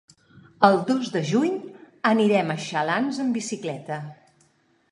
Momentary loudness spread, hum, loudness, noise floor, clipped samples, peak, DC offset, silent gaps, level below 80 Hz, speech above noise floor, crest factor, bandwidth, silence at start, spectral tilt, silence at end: 14 LU; none; -24 LUFS; -63 dBFS; under 0.1%; -2 dBFS; under 0.1%; none; -72 dBFS; 41 dB; 22 dB; 11 kHz; 0.35 s; -5.5 dB/octave; 0.8 s